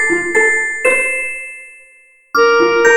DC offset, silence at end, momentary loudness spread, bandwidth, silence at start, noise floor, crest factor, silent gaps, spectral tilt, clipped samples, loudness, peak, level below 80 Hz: under 0.1%; 0 s; 14 LU; 17 kHz; 0 s; -47 dBFS; 14 dB; none; -2 dB/octave; under 0.1%; -13 LUFS; 0 dBFS; -52 dBFS